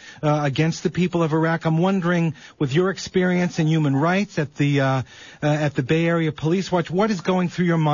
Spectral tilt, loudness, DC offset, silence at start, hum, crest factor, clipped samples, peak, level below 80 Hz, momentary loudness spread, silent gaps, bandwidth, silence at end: -7 dB/octave; -21 LUFS; under 0.1%; 0.05 s; none; 12 dB; under 0.1%; -8 dBFS; -56 dBFS; 4 LU; none; 7.4 kHz; 0 s